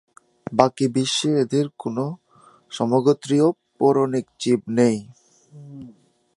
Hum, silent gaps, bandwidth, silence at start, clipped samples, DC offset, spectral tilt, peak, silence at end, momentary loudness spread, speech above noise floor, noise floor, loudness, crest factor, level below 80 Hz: none; none; 11.5 kHz; 0.5 s; under 0.1%; under 0.1%; -5.5 dB/octave; 0 dBFS; 0.45 s; 20 LU; 30 dB; -51 dBFS; -21 LUFS; 22 dB; -64 dBFS